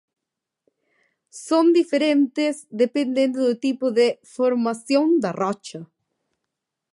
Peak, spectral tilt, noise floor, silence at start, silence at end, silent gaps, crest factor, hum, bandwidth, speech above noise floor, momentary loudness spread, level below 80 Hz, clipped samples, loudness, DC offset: -8 dBFS; -5 dB/octave; -84 dBFS; 1.35 s; 1.1 s; none; 14 dB; none; 11.5 kHz; 64 dB; 8 LU; -76 dBFS; under 0.1%; -21 LUFS; under 0.1%